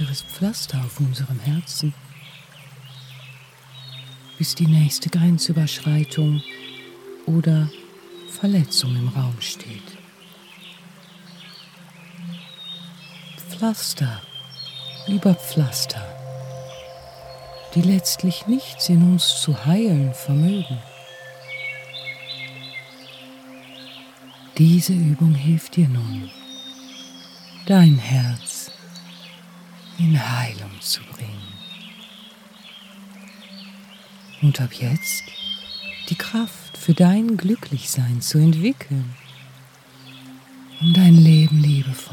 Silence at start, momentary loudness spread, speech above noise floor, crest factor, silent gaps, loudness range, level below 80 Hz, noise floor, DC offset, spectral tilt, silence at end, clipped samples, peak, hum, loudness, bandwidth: 0 s; 24 LU; 28 dB; 18 dB; none; 12 LU; -64 dBFS; -46 dBFS; under 0.1%; -5.5 dB/octave; 0 s; under 0.1%; -2 dBFS; none; -19 LUFS; 16.5 kHz